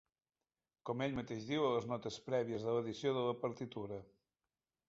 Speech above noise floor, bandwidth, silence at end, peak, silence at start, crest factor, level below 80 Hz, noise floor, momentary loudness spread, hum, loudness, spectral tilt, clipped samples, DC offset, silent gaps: over 51 dB; 7.6 kHz; 0.85 s; -24 dBFS; 0.85 s; 18 dB; -72 dBFS; under -90 dBFS; 10 LU; none; -40 LUFS; -5 dB/octave; under 0.1%; under 0.1%; none